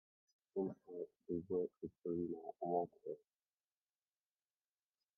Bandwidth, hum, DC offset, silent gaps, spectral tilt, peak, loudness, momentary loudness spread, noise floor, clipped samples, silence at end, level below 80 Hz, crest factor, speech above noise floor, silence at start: 3.5 kHz; none; under 0.1%; none; -10 dB/octave; -26 dBFS; -45 LUFS; 10 LU; under -90 dBFS; under 0.1%; 2 s; -82 dBFS; 20 dB; over 47 dB; 0.55 s